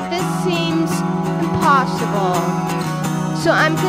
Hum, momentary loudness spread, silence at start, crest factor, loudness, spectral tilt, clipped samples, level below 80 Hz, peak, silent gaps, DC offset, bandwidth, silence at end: none; 6 LU; 0 s; 16 dB; -18 LUFS; -5.5 dB/octave; under 0.1%; -48 dBFS; -2 dBFS; none; under 0.1%; 16 kHz; 0 s